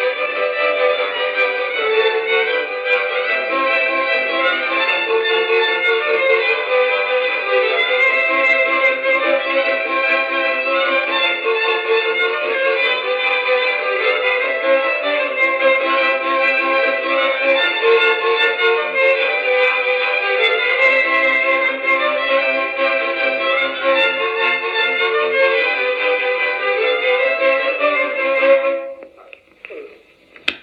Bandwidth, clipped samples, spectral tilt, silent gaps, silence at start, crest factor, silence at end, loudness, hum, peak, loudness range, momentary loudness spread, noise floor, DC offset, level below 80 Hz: 6.6 kHz; under 0.1%; -2.5 dB/octave; none; 0 s; 16 dB; 0.05 s; -15 LUFS; none; 0 dBFS; 2 LU; 4 LU; -46 dBFS; under 0.1%; -70 dBFS